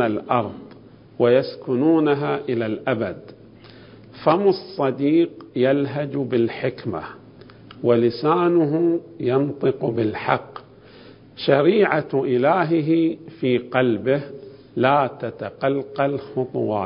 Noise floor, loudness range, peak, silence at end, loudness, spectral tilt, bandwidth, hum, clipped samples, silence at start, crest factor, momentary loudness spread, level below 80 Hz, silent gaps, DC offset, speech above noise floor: -45 dBFS; 3 LU; -2 dBFS; 0 s; -21 LUFS; -11.5 dB/octave; 5.4 kHz; none; under 0.1%; 0 s; 20 dB; 10 LU; -60 dBFS; none; under 0.1%; 25 dB